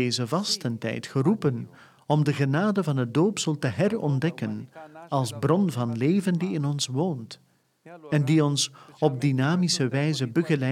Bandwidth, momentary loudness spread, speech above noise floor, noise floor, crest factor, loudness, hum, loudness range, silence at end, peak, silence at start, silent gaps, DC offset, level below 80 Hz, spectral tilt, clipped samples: 14 kHz; 8 LU; 25 dB; -50 dBFS; 18 dB; -25 LUFS; none; 2 LU; 0 s; -8 dBFS; 0 s; none; under 0.1%; -68 dBFS; -5.5 dB/octave; under 0.1%